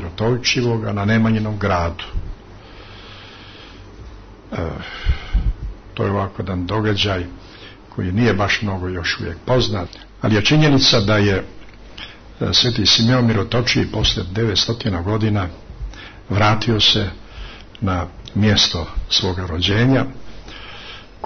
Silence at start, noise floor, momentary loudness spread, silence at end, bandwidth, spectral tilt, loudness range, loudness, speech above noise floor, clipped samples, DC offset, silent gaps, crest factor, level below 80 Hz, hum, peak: 0 s; -39 dBFS; 23 LU; 0 s; 6.6 kHz; -5 dB/octave; 10 LU; -18 LUFS; 21 dB; under 0.1%; under 0.1%; none; 16 dB; -32 dBFS; none; -2 dBFS